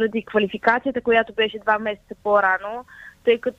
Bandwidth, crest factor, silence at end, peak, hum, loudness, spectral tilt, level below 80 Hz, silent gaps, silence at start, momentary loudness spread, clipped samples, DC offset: 6.8 kHz; 18 dB; 0.05 s; -4 dBFS; none; -21 LUFS; -6 dB/octave; -56 dBFS; none; 0 s; 11 LU; under 0.1%; under 0.1%